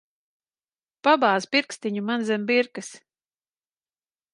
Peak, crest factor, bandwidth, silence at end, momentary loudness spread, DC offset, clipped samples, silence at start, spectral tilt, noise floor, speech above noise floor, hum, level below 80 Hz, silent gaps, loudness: -6 dBFS; 22 dB; 11.5 kHz; 1.35 s; 11 LU; under 0.1%; under 0.1%; 1.05 s; -4 dB/octave; under -90 dBFS; over 67 dB; none; -80 dBFS; none; -23 LUFS